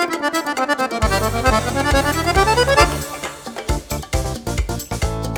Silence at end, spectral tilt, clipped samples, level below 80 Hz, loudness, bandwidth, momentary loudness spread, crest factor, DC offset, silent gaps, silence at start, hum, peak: 0 s; -4 dB/octave; under 0.1%; -26 dBFS; -19 LUFS; over 20 kHz; 10 LU; 18 dB; under 0.1%; none; 0 s; none; -2 dBFS